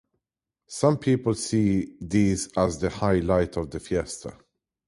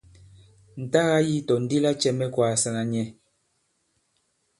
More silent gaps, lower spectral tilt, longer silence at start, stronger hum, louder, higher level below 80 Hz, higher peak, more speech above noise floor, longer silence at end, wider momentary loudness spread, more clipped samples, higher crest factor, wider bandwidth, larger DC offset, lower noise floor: neither; about the same, -6 dB/octave vs -5 dB/octave; about the same, 0.7 s vs 0.75 s; neither; about the same, -25 LUFS vs -24 LUFS; first, -44 dBFS vs -62 dBFS; about the same, -6 dBFS vs -6 dBFS; first, 63 dB vs 48 dB; second, 0.55 s vs 1.5 s; about the same, 10 LU vs 11 LU; neither; about the same, 18 dB vs 20 dB; about the same, 11.5 kHz vs 11.5 kHz; neither; first, -88 dBFS vs -72 dBFS